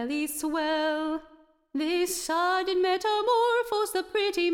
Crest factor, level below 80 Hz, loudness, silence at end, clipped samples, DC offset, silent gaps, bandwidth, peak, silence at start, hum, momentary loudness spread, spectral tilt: 12 dB; -62 dBFS; -27 LUFS; 0 s; under 0.1%; under 0.1%; none; 18 kHz; -14 dBFS; 0 s; none; 7 LU; -1 dB/octave